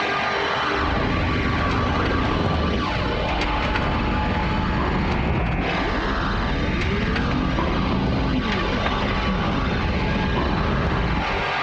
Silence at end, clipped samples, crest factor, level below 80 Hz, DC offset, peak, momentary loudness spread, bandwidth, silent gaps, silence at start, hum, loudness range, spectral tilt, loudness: 0 s; under 0.1%; 14 dB; -28 dBFS; under 0.1%; -8 dBFS; 1 LU; 8.2 kHz; none; 0 s; none; 1 LU; -6.5 dB/octave; -22 LUFS